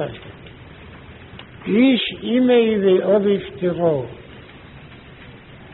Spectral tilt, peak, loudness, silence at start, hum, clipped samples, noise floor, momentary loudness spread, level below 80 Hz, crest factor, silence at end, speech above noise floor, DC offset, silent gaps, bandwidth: -5 dB/octave; -4 dBFS; -18 LUFS; 0 s; none; under 0.1%; -41 dBFS; 25 LU; -50 dBFS; 16 dB; 0.05 s; 24 dB; under 0.1%; none; 4.1 kHz